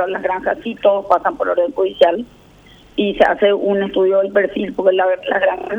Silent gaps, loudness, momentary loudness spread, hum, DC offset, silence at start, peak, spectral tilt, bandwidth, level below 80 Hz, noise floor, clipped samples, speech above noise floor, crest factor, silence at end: none; -16 LUFS; 6 LU; none; under 0.1%; 0 s; 0 dBFS; -6.5 dB/octave; 7 kHz; -50 dBFS; -45 dBFS; under 0.1%; 29 dB; 16 dB; 0 s